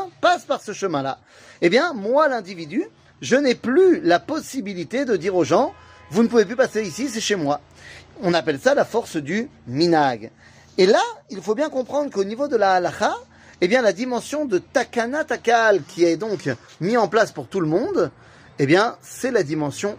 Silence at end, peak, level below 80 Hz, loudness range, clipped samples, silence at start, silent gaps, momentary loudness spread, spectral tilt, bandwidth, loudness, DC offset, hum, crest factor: 0 s; -4 dBFS; -62 dBFS; 2 LU; under 0.1%; 0 s; none; 10 LU; -5 dB/octave; 15.5 kHz; -21 LUFS; under 0.1%; none; 18 dB